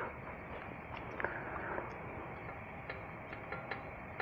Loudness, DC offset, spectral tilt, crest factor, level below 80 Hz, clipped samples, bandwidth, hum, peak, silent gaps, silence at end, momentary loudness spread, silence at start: -44 LUFS; under 0.1%; -7.5 dB/octave; 26 dB; -58 dBFS; under 0.1%; over 20 kHz; none; -18 dBFS; none; 0 s; 6 LU; 0 s